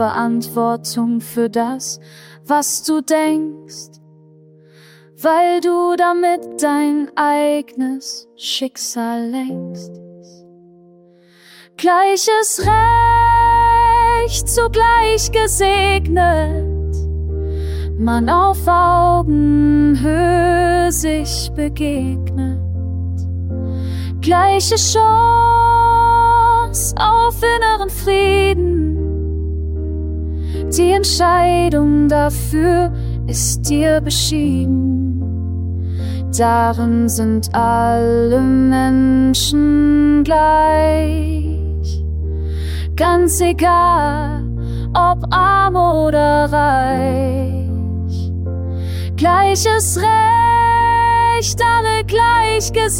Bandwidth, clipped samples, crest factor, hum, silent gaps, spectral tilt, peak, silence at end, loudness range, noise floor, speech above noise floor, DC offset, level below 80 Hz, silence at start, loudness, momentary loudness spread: 17 kHz; under 0.1%; 14 dB; none; none; -5 dB/octave; -2 dBFS; 0 s; 7 LU; -48 dBFS; 34 dB; under 0.1%; -26 dBFS; 0 s; -15 LUFS; 11 LU